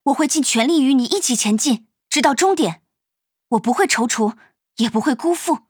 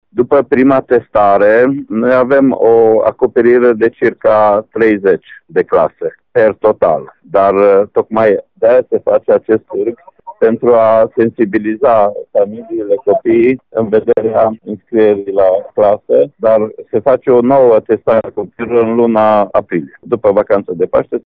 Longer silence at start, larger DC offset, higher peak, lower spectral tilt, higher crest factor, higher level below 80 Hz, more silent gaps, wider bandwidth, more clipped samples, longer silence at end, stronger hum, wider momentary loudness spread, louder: about the same, 0.05 s vs 0.15 s; neither; about the same, -2 dBFS vs 0 dBFS; second, -3 dB/octave vs -9.5 dB/octave; first, 18 dB vs 10 dB; second, -70 dBFS vs -50 dBFS; neither; first, over 20 kHz vs 4.7 kHz; neither; about the same, 0.1 s vs 0.05 s; neither; about the same, 7 LU vs 8 LU; second, -18 LUFS vs -11 LUFS